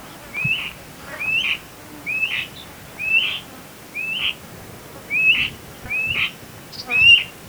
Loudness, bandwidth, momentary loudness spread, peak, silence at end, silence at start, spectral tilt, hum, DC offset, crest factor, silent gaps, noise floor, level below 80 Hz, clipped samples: -18 LUFS; over 20 kHz; 24 LU; -2 dBFS; 0 s; 0 s; -1.5 dB/octave; none; under 0.1%; 20 dB; none; -39 dBFS; -52 dBFS; under 0.1%